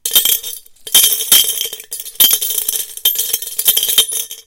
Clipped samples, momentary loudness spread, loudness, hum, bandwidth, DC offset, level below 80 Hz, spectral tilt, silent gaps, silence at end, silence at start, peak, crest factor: 0.3%; 12 LU; -11 LUFS; none; over 20 kHz; under 0.1%; -54 dBFS; 2.5 dB/octave; none; 0.05 s; 0.05 s; 0 dBFS; 16 dB